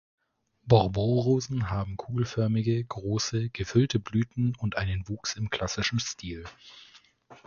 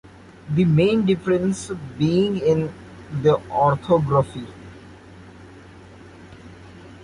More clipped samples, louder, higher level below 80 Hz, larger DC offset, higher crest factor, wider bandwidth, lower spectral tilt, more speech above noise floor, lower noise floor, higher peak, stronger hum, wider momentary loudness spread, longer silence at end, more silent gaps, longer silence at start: neither; second, -28 LUFS vs -21 LUFS; about the same, -48 dBFS vs -50 dBFS; neither; first, 24 dB vs 16 dB; second, 7.2 kHz vs 11.5 kHz; second, -5.5 dB/octave vs -7.5 dB/octave; first, 31 dB vs 24 dB; first, -58 dBFS vs -44 dBFS; about the same, -6 dBFS vs -6 dBFS; neither; second, 13 LU vs 17 LU; about the same, 0.1 s vs 0 s; neither; first, 0.65 s vs 0.45 s